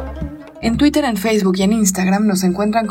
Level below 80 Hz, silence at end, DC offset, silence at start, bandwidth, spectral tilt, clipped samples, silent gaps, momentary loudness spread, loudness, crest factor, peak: -36 dBFS; 0 s; under 0.1%; 0 s; 16.5 kHz; -5 dB/octave; under 0.1%; none; 11 LU; -16 LUFS; 12 dB; -4 dBFS